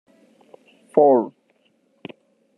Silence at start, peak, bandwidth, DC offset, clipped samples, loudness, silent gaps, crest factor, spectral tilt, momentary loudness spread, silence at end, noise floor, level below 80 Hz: 0.95 s; -2 dBFS; 10 kHz; under 0.1%; under 0.1%; -18 LUFS; none; 22 dB; -8.5 dB/octave; 26 LU; 1.3 s; -64 dBFS; -78 dBFS